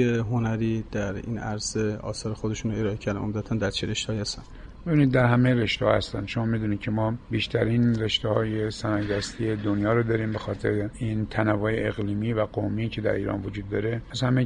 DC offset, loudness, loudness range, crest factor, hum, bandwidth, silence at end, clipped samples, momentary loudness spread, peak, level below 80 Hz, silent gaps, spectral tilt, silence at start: under 0.1%; -26 LUFS; 5 LU; 18 dB; none; 10 kHz; 0 s; under 0.1%; 8 LU; -8 dBFS; -44 dBFS; none; -6 dB/octave; 0 s